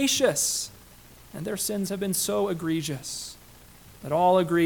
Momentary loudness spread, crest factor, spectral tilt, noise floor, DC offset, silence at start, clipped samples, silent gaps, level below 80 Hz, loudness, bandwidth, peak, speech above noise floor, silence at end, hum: 17 LU; 16 dB; -3.5 dB/octave; -50 dBFS; under 0.1%; 0 s; under 0.1%; none; -58 dBFS; -26 LUFS; 19 kHz; -10 dBFS; 25 dB; 0 s; 60 Hz at -55 dBFS